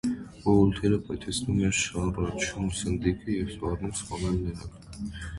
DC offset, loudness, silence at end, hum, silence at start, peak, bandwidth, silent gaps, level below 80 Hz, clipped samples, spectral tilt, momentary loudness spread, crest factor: under 0.1%; -28 LUFS; 0 s; none; 0.05 s; -10 dBFS; 11.5 kHz; none; -42 dBFS; under 0.1%; -5 dB/octave; 13 LU; 20 dB